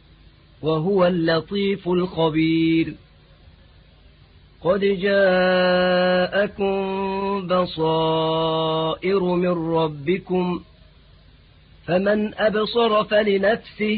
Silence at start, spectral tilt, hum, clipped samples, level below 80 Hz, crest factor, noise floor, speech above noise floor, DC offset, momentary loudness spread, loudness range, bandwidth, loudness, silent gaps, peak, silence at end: 0.65 s; -11 dB/octave; none; under 0.1%; -50 dBFS; 14 dB; -51 dBFS; 31 dB; under 0.1%; 6 LU; 4 LU; 4.9 kHz; -21 LUFS; none; -6 dBFS; 0 s